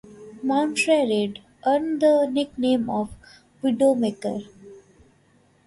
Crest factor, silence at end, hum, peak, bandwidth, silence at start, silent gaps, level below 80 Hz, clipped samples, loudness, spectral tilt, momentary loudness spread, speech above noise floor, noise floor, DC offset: 16 dB; 0.9 s; none; -8 dBFS; 11.5 kHz; 0.1 s; none; -60 dBFS; under 0.1%; -23 LUFS; -5 dB/octave; 11 LU; 38 dB; -60 dBFS; under 0.1%